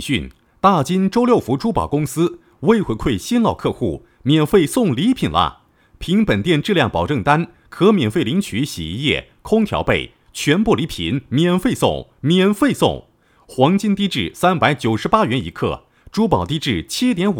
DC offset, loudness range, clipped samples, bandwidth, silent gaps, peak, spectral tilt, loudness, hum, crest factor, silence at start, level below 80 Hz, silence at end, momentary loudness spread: under 0.1%; 1 LU; under 0.1%; 18.5 kHz; none; 0 dBFS; -6 dB/octave; -18 LUFS; none; 18 dB; 0 s; -40 dBFS; 0 s; 8 LU